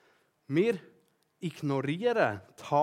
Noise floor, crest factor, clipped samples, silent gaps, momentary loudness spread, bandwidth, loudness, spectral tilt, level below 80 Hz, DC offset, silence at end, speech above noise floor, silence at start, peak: -67 dBFS; 20 dB; under 0.1%; none; 12 LU; 15 kHz; -31 LUFS; -7 dB/octave; -84 dBFS; under 0.1%; 0 s; 38 dB; 0.5 s; -10 dBFS